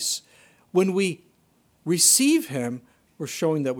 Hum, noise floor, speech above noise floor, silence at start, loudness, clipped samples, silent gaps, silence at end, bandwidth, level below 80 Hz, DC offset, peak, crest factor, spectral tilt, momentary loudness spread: none; -63 dBFS; 41 dB; 0 s; -22 LUFS; under 0.1%; none; 0 s; 18 kHz; -72 dBFS; under 0.1%; -4 dBFS; 20 dB; -3 dB/octave; 21 LU